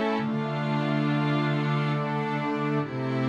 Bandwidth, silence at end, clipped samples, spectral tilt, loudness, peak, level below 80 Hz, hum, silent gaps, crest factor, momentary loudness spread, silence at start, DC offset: 7.4 kHz; 0 s; under 0.1%; -8 dB/octave; -27 LUFS; -14 dBFS; -70 dBFS; none; none; 12 dB; 3 LU; 0 s; under 0.1%